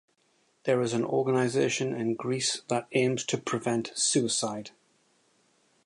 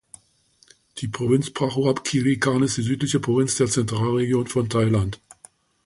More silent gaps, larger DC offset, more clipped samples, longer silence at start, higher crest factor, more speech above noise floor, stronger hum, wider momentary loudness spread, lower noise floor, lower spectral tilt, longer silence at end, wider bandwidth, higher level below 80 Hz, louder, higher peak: neither; neither; neither; second, 0.65 s vs 0.95 s; about the same, 16 dB vs 16 dB; about the same, 41 dB vs 39 dB; neither; second, 5 LU vs 8 LU; first, -69 dBFS vs -60 dBFS; second, -4 dB/octave vs -5.5 dB/octave; first, 1.15 s vs 0.7 s; about the same, 11.5 kHz vs 11.5 kHz; second, -74 dBFS vs -50 dBFS; second, -28 LUFS vs -22 LUFS; second, -12 dBFS vs -6 dBFS